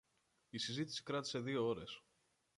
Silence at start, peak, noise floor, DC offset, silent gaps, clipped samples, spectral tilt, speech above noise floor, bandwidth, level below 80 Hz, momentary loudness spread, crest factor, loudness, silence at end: 0.55 s; -28 dBFS; -81 dBFS; under 0.1%; none; under 0.1%; -4.5 dB/octave; 39 dB; 11.5 kHz; -76 dBFS; 12 LU; 16 dB; -42 LUFS; 0.6 s